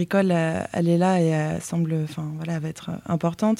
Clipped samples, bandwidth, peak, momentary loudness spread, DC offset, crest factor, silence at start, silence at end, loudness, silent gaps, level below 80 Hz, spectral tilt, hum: under 0.1%; 14 kHz; -8 dBFS; 10 LU; under 0.1%; 16 dB; 0 s; 0 s; -24 LUFS; none; -58 dBFS; -7 dB/octave; none